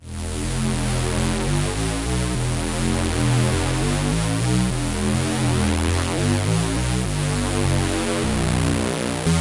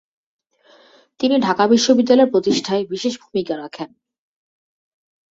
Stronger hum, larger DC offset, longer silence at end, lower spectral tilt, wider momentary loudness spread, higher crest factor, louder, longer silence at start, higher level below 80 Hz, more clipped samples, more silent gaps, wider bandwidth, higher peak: neither; first, 0.3% vs under 0.1%; second, 0 s vs 1.45 s; about the same, -5 dB/octave vs -4.5 dB/octave; second, 3 LU vs 14 LU; about the same, 14 dB vs 18 dB; second, -22 LUFS vs -17 LUFS; second, 0 s vs 1.2 s; first, -30 dBFS vs -62 dBFS; neither; neither; first, 11.5 kHz vs 7.8 kHz; second, -6 dBFS vs -2 dBFS